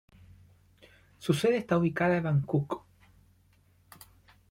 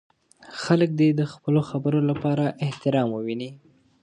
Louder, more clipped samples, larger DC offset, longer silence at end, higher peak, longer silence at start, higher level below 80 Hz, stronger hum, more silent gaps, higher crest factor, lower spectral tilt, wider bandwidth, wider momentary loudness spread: second, -29 LUFS vs -24 LUFS; neither; neither; first, 1.75 s vs 0.45 s; second, -12 dBFS vs -4 dBFS; first, 1.2 s vs 0.5 s; about the same, -64 dBFS vs -64 dBFS; first, 50 Hz at -65 dBFS vs none; neither; about the same, 20 dB vs 20 dB; about the same, -7 dB/octave vs -7.5 dB/octave; first, 16.5 kHz vs 10 kHz; about the same, 12 LU vs 12 LU